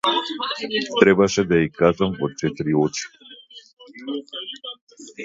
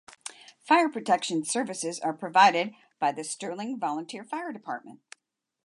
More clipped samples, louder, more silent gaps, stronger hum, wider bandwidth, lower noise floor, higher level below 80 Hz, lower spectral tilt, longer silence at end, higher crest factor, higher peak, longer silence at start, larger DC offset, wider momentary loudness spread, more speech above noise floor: neither; first, -21 LUFS vs -27 LUFS; first, 3.73-3.77 s, 4.81-4.87 s vs none; neither; second, 8 kHz vs 11.5 kHz; second, -45 dBFS vs -77 dBFS; first, -52 dBFS vs -84 dBFS; first, -5 dB/octave vs -3 dB/octave; second, 0 s vs 0.75 s; about the same, 22 dB vs 22 dB; first, 0 dBFS vs -6 dBFS; second, 0.05 s vs 0.25 s; neither; first, 20 LU vs 17 LU; second, 24 dB vs 50 dB